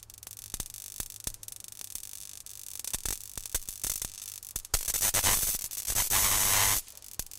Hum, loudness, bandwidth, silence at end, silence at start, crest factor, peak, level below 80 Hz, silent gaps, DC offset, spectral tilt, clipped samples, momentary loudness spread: none; -29 LUFS; 18 kHz; 0 s; 0 s; 22 dB; -10 dBFS; -46 dBFS; none; under 0.1%; 0 dB/octave; under 0.1%; 18 LU